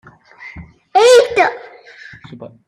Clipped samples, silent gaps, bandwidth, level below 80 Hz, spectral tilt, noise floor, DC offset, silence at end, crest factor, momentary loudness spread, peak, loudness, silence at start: under 0.1%; none; 13.5 kHz; -52 dBFS; -2.5 dB/octave; -39 dBFS; under 0.1%; 0.2 s; 16 dB; 26 LU; 0 dBFS; -11 LUFS; 0.4 s